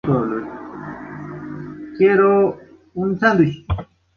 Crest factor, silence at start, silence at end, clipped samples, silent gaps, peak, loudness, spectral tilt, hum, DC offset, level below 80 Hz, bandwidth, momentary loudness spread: 16 dB; 0.05 s; 0.35 s; under 0.1%; none; -2 dBFS; -18 LUFS; -8.5 dB/octave; none; under 0.1%; -40 dBFS; 6.6 kHz; 19 LU